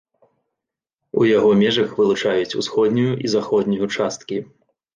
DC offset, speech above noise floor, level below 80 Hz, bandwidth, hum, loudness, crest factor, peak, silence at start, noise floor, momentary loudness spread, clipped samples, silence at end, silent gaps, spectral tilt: under 0.1%; 66 dB; -60 dBFS; 9.2 kHz; none; -19 LUFS; 16 dB; -4 dBFS; 1.15 s; -84 dBFS; 10 LU; under 0.1%; 0.5 s; none; -5.5 dB/octave